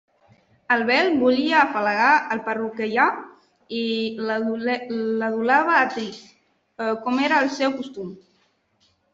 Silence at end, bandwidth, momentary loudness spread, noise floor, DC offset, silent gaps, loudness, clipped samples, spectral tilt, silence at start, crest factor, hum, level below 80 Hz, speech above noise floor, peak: 0.95 s; 7.8 kHz; 13 LU; -65 dBFS; under 0.1%; none; -21 LUFS; under 0.1%; -4.5 dB/octave; 0.7 s; 18 dB; none; -70 dBFS; 44 dB; -4 dBFS